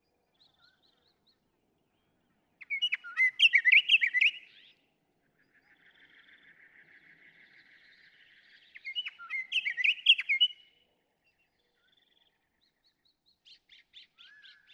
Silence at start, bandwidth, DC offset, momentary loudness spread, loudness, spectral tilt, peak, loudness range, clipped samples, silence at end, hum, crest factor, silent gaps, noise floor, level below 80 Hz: 2.7 s; 11 kHz; under 0.1%; 16 LU; -25 LUFS; 3.5 dB/octave; -12 dBFS; 13 LU; under 0.1%; 4.2 s; none; 22 dB; none; -76 dBFS; -90 dBFS